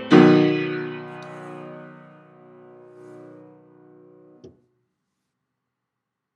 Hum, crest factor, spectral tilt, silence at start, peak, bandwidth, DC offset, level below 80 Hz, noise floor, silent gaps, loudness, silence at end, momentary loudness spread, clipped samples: none; 24 dB; -7.5 dB/octave; 0 s; 0 dBFS; 7.6 kHz; under 0.1%; -70 dBFS; -83 dBFS; none; -18 LUFS; 4.5 s; 30 LU; under 0.1%